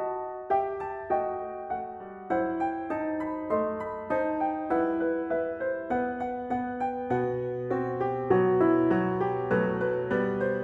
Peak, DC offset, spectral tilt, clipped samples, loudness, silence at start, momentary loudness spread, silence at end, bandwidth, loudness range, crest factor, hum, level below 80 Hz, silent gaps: -12 dBFS; under 0.1%; -9.5 dB/octave; under 0.1%; -29 LUFS; 0 s; 9 LU; 0 s; 4.7 kHz; 5 LU; 18 dB; none; -60 dBFS; none